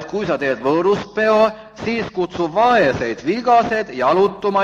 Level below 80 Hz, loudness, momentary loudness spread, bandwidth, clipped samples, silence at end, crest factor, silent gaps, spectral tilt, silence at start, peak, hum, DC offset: -50 dBFS; -17 LUFS; 7 LU; 7.6 kHz; under 0.1%; 0 s; 14 dB; none; -6 dB/octave; 0 s; -2 dBFS; none; under 0.1%